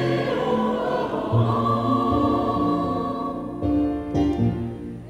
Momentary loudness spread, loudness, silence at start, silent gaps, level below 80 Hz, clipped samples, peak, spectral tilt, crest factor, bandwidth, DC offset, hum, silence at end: 6 LU; -23 LUFS; 0 s; none; -40 dBFS; under 0.1%; -8 dBFS; -8.5 dB/octave; 14 dB; 9.8 kHz; under 0.1%; none; 0 s